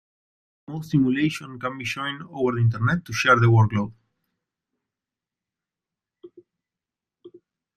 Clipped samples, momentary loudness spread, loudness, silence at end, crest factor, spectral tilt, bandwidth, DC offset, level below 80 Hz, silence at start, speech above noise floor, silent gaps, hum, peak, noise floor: under 0.1%; 14 LU; -22 LUFS; 0.5 s; 22 dB; -6.5 dB/octave; 13 kHz; under 0.1%; -56 dBFS; 0.7 s; 67 dB; none; none; -4 dBFS; -89 dBFS